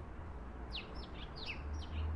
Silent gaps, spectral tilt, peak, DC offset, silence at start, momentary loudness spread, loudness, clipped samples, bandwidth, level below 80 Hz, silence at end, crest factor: none; -6 dB/octave; -30 dBFS; under 0.1%; 0 s; 6 LU; -46 LUFS; under 0.1%; 10.5 kHz; -48 dBFS; 0 s; 14 dB